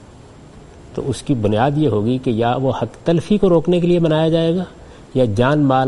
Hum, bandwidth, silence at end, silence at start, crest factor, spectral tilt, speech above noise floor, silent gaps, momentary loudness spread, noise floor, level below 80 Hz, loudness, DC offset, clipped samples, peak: none; 11.5 kHz; 0 s; 0 s; 16 dB; -7.5 dB/octave; 25 dB; none; 10 LU; -41 dBFS; -42 dBFS; -17 LUFS; under 0.1%; under 0.1%; -2 dBFS